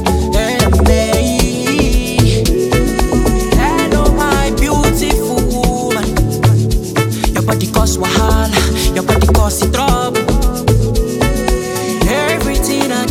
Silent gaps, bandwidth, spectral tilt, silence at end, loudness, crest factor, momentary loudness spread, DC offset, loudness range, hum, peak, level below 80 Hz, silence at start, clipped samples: none; 17 kHz; -5 dB/octave; 0 s; -13 LUFS; 12 dB; 4 LU; under 0.1%; 1 LU; none; 0 dBFS; -18 dBFS; 0 s; under 0.1%